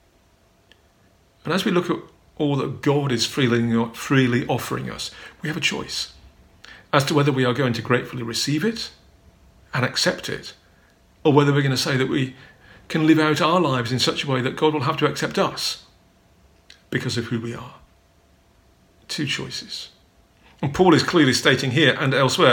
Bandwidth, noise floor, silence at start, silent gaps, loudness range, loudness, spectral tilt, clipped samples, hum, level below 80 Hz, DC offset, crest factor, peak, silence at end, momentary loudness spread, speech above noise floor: 19 kHz; -58 dBFS; 1.45 s; none; 9 LU; -21 LUFS; -5 dB/octave; under 0.1%; none; -56 dBFS; under 0.1%; 22 dB; 0 dBFS; 0 s; 14 LU; 38 dB